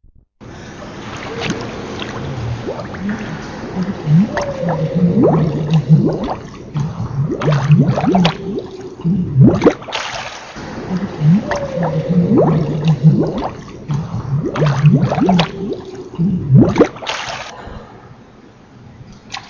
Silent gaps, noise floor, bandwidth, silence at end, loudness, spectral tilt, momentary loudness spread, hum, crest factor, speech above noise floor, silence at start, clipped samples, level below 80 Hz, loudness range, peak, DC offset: none; -42 dBFS; 7.2 kHz; 0 s; -16 LUFS; -7.5 dB/octave; 16 LU; none; 16 dB; 28 dB; 0.4 s; under 0.1%; -38 dBFS; 5 LU; 0 dBFS; under 0.1%